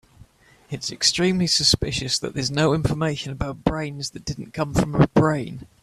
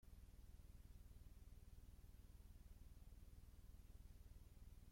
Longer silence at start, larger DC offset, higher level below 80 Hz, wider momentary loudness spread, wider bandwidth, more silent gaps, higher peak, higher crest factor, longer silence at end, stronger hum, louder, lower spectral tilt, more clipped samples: first, 0.2 s vs 0 s; neither; first, -40 dBFS vs -64 dBFS; first, 13 LU vs 1 LU; second, 14 kHz vs 16.5 kHz; neither; first, 0 dBFS vs -50 dBFS; first, 22 dB vs 12 dB; first, 0.2 s vs 0 s; neither; first, -22 LUFS vs -67 LUFS; about the same, -4.5 dB/octave vs -5.5 dB/octave; neither